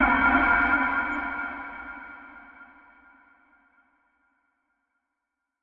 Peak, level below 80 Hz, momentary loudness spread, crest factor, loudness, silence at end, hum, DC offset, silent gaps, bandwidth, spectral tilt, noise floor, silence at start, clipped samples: -8 dBFS; -48 dBFS; 25 LU; 20 dB; -23 LUFS; 3 s; none; under 0.1%; none; 5.4 kHz; -7 dB/octave; -83 dBFS; 0 s; under 0.1%